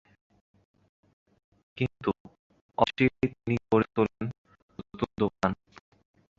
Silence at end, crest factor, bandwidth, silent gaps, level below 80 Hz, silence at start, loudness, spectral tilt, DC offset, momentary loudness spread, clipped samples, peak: 0.85 s; 26 dB; 7.6 kHz; 2.20-2.25 s, 2.39-2.50 s, 2.61-2.69 s, 4.38-4.45 s, 4.62-4.69 s; -56 dBFS; 1.75 s; -29 LUFS; -7.5 dB/octave; under 0.1%; 16 LU; under 0.1%; -6 dBFS